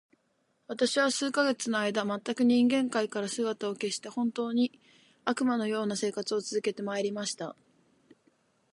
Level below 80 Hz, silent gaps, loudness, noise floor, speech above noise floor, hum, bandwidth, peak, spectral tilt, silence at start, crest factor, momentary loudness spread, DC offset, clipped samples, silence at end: -82 dBFS; none; -30 LUFS; -74 dBFS; 44 dB; none; 11.5 kHz; -12 dBFS; -3.5 dB/octave; 0.7 s; 18 dB; 8 LU; under 0.1%; under 0.1%; 1.2 s